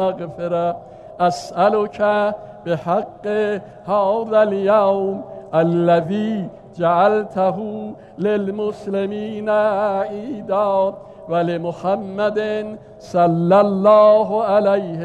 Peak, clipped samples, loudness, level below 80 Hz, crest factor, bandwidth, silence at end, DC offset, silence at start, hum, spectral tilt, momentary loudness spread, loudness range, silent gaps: -2 dBFS; under 0.1%; -18 LUFS; -58 dBFS; 16 dB; 9 kHz; 0 s; under 0.1%; 0 s; none; -7.5 dB/octave; 12 LU; 4 LU; none